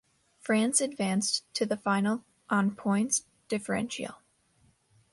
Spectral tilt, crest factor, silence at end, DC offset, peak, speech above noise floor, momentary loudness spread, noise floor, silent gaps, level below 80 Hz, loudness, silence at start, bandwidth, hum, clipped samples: -3.5 dB/octave; 20 dB; 0.95 s; under 0.1%; -12 dBFS; 38 dB; 9 LU; -67 dBFS; none; -70 dBFS; -29 LUFS; 0.45 s; 11.5 kHz; none; under 0.1%